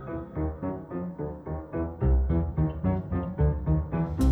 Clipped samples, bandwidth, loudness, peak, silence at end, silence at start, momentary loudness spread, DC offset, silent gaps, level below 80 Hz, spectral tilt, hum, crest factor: under 0.1%; 11 kHz; -29 LUFS; -12 dBFS; 0 s; 0 s; 9 LU; under 0.1%; none; -32 dBFS; -9.5 dB/octave; none; 14 dB